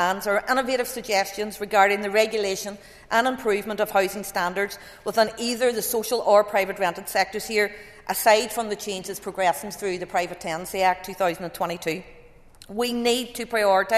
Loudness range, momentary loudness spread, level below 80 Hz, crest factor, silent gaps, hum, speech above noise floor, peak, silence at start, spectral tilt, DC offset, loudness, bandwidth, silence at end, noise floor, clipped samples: 4 LU; 11 LU; -56 dBFS; 20 dB; none; none; 24 dB; -4 dBFS; 0 s; -3 dB/octave; under 0.1%; -24 LUFS; 14 kHz; 0 s; -48 dBFS; under 0.1%